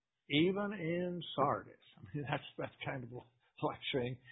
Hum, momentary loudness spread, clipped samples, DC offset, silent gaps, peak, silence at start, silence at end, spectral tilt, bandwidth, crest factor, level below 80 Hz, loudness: none; 15 LU; under 0.1%; under 0.1%; none; -18 dBFS; 0.3 s; 0 s; -4 dB/octave; 3.9 kHz; 20 dB; -70 dBFS; -38 LUFS